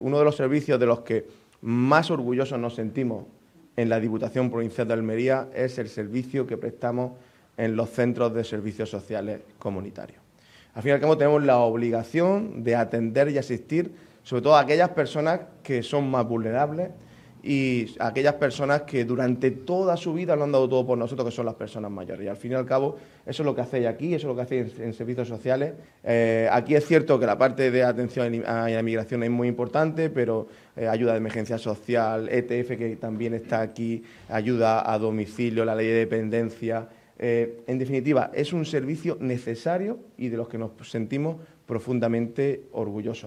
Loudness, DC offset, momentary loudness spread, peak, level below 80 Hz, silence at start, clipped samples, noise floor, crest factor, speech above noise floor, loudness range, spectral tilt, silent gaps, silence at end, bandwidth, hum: -25 LUFS; under 0.1%; 12 LU; -4 dBFS; -66 dBFS; 0 s; under 0.1%; -55 dBFS; 22 dB; 31 dB; 6 LU; -7.5 dB/octave; none; 0 s; 12 kHz; none